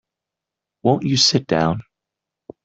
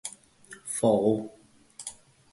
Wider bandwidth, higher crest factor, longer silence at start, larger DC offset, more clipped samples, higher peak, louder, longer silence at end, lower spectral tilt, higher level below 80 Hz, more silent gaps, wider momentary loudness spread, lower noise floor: second, 8.2 kHz vs 12 kHz; about the same, 20 dB vs 20 dB; first, 0.85 s vs 0.05 s; neither; neither; first, -2 dBFS vs -10 dBFS; first, -18 LUFS vs -26 LUFS; first, 0.85 s vs 0.4 s; about the same, -4.5 dB/octave vs -5.5 dB/octave; first, -54 dBFS vs -66 dBFS; neither; second, 8 LU vs 20 LU; first, -85 dBFS vs -52 dBFS